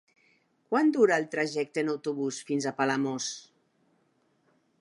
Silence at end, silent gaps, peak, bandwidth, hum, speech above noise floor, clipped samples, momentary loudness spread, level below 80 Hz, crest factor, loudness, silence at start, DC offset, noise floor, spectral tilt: 1.4 s; none; -12 dBFS; 11.5 kHz; none; 43 dB; under 0.1%; 10 LU; -84 dBFS; 18 dB; -28 LUFS; 0.7 s; under 0.1%; -70 dBFS; -4.5 dB/octave